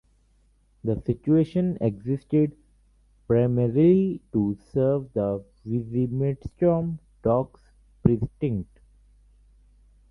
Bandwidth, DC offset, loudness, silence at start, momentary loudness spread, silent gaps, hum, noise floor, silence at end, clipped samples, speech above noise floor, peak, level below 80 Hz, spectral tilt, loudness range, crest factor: 5.4 kHz; under 0.1%; -25 LUFS; 0.85 s; 10 LU; none; 50 Hz at -50 dBFS; -62 dBFS; 1.45 s; under 0.1%; 39 dB; -4 dBFS; -50 dBFS; -11.5 dB/octave; 4 LU; 22 dB